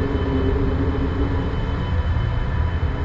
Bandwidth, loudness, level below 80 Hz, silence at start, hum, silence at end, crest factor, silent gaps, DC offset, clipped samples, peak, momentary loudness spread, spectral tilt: 7 kHz; -23 LUFS; -24 dBFS; 0 s; none; 0 s; 12 dB; none; under 0.1%; under 0.1%; -8 dBFS; 2 LU; -9 dB/octave